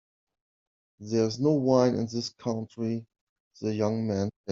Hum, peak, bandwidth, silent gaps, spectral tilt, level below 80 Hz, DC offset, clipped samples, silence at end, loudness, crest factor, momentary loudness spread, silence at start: none; -8 dBFS; 7.6 kHz; 3.21-3.51 s, 4.36-4.44 s; -7 dB/octave; -68 dBFS; under 0.1%; under 0.1%; 0 s; -28 LUFS; 20 dB; 10 LU; 1 s